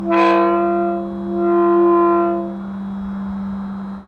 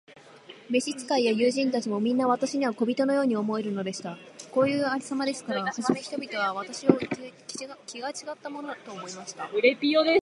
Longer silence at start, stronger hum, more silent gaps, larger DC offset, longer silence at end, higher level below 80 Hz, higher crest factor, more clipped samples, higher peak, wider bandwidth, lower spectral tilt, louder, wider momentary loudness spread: about the same, 0 s vs 0.1 s; neither; neither; neither; about the same, 0.05 s vs 0 s; first, -48 dBFS vs -74 dBFS; second, 14 dB vs 24 dB; neither; about the same, -4 dBFS vs -2 dBFS; second, 5.2 kHz vs 11.5 kHz; first, -8.5 dB/octave vs -4.5 dB/octave; first, -17 LUFS vs -27 LUFS; about the same, 13 LU vs 14 LU